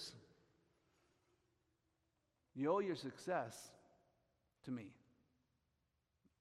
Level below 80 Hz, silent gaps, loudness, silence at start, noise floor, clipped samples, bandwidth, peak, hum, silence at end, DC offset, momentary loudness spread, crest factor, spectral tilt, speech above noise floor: -86 dBFS; none; -44 LUFS; 0 s; -86 dBFS; under 0.1%; 13.5 kHz; -26 dBFS; none; 1.45 s; under 0.1%; 21 LU; 24 dB; -5.5 dB/octave; 43 dB